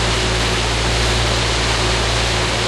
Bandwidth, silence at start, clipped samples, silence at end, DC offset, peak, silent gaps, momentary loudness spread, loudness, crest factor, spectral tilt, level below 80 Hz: 12.5 kHz; 0 s; under 0.1%; 0 s; under 0.1%; -4 dBFS; none; 1 LU; -16 LUFS; 12 dB; -3 dB/octave; -24 dBFS